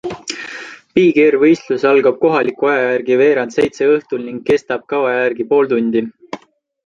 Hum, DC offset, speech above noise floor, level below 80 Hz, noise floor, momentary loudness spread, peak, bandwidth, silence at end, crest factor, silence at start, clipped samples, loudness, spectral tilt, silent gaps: none; under 0.1%; 25 dB; -56 dBFS; -39 dBFS; 15 LU; -2 dBFS; 7.8 kHz; 0.5 s; 14 dB; 0.05 s; under 0.1%; -15 LUFS; -5.5 dB/octave; none